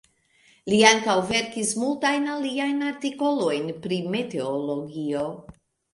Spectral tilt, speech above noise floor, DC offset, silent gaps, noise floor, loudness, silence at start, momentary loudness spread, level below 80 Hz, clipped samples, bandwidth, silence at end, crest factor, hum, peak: -3.5 dB/octave; 37 dB; under 0.1%; none; -60 dBFS; -24 LUFS; 0.65 s; 12 LU; -62 dBFS; under 0.1%; 11.5 kHz; 0.4 s; 24 dB; none; 0 dBFS